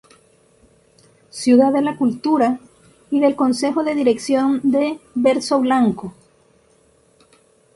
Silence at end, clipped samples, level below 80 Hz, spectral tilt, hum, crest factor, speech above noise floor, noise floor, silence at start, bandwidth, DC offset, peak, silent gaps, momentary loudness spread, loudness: 1.65 s; under 0.1%; -62 dBFS; -5 dB/octave; none; 16 dB; 39 dB; -56 dBFS; 1.35 s; 11.5 kHz; under 0.1%; -2 dBFS; none; 9 LU; -18 LUFS